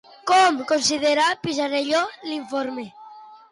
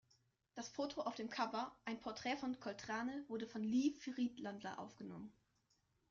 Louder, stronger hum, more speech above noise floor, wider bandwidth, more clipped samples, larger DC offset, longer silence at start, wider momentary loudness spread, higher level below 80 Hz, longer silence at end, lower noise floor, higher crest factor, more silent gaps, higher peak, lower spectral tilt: first, -21 LUFS vs -44 LUFS; neither; second, 23 dB vs 37 dB; first, 11.5 kHz vs 7.4 kHz; neither; neither; second, 0.25 s vs 0.55 s; about the same, 14 LU vs 13 LU; first, -66 dBFS vs -80 dBFS; second, 0.15 s vs 0.8 s; second, -44 dBFS vs -81 dBFS; about the same, 14 dB vs 18 dB; neither; first, -8 dBFS vs -28 dBFS; about the same, -2.5 dB/octave vs -3.5 dB/octave